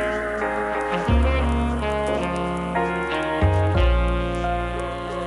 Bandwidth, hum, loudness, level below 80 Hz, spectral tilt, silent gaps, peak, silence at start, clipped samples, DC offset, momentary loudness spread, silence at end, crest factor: 11.5 kHz; none; -23 LUFS; -26 dBFS; -7 dB/octave; none; -10 dBFS; 0 s; under 0.1%; under 0.1%; 5 LU; 0 s; 12 dB